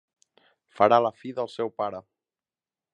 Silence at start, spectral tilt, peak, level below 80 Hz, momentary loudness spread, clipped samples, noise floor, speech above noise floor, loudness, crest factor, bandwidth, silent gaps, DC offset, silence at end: 0.8 s; -6.5 dB/octave; -4 dBFS; -72 dBFS; 13 LU; under 0.1%; under -90 dBFS; over 66 dB; -25 LUFS; 24 dB; 9.2 kHz; none; under 0.1%; 0.9 s